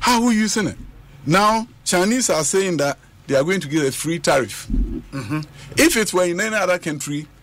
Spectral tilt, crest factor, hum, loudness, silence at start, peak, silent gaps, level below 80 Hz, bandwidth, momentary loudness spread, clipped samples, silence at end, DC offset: -3.5 dB/octave; 16 dB; none; -19 LUFS; 0 s; -4 dBFS; none; -34 dBFS; 16 kHz; 11 LU; under 0.1%; 0.15 s; under 0.1%